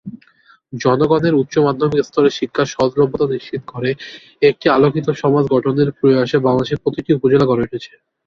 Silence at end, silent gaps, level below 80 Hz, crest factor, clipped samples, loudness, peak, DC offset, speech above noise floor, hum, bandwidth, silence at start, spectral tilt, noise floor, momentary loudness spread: 0.4 s; none; -50 dBFS; 14 dB; under 0.1%; -16 LUFS; -2 dBFS; under 0.1%; 36 dB; none; 7.2 kHz; 0.05 s; -7 dB/octave; -52 dBFS; 10 LU